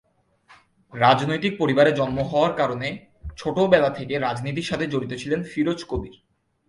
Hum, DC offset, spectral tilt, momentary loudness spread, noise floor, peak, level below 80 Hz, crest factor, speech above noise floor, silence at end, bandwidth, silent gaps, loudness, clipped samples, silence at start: none; under 0.1%; -6 dB/octave; 13 LU; -57 dBFS; -2 dBFS; -48 dBFS; 20 dB; 35 dB; 0.55 s; 11.5 kHz; none; -22 LUFS; under 0.1%; 0.5 s